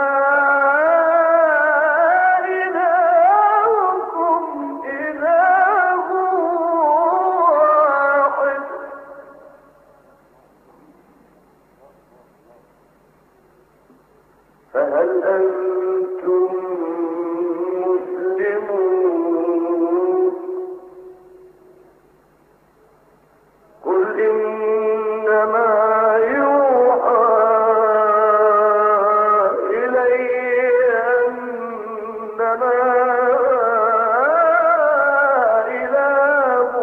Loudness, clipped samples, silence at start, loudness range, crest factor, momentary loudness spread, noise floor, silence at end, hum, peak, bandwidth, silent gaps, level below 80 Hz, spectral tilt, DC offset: -16 LUFS; under 0.1%; 0 s; 9 LU; 14 dB; 9 LU; -54 dBFS; 0 s; none; -4 dBFS; 4.1 kHz; none; -66 dBFS; -7 dB/octave; under 0.1%